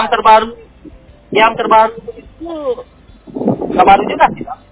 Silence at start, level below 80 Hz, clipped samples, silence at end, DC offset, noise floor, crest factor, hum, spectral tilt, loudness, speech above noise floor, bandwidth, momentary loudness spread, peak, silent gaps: 0 s; -42 dBFS; 0.1%; 0.15 s; under 0.1%; -38 dBFS; 14 dB; none; -8.5 dB/octave; -12 LUFS; 26 dB; 4 kHz; 19 LU; 0 dBFS; none